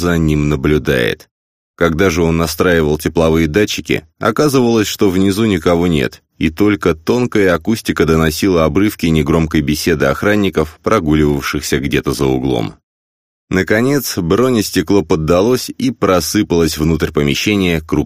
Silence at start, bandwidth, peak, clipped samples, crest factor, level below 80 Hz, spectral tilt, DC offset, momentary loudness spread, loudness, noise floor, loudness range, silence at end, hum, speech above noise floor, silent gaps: 0 s; 15.5 kHz; 0 dBFS; under 0.1%; 14 dB; -32 dBFS; -5.5 dB/octave; 0.1%; 5 LU; -14 LUFS; under -90 dBFS; 2 LU; 0 s; none; over 77 dB; 1.31-1.74 s, 12.83-13.48 s